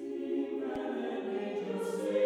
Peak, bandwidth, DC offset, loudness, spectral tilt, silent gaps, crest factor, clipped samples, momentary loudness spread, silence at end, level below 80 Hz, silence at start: -18 dBFS; 14.5 kHz; under 0.1%; -36 LUFS; -6 dB/octave; none; 16 dB; under 0.1%; 2 LU; 0 s; -74 dBFS; 0 s